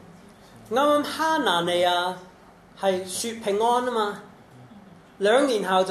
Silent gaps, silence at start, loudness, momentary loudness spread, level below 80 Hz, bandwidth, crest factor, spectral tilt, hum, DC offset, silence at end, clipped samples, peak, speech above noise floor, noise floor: none; 0 s; -23 LUFS; 8 LU; -64 dBFS; 14 kHz; 18 dB; -3.5 dB/octave; none; under 0.1%; 0 s; under 0.1%; -8 dBFS; 26 dB; -48 dBFS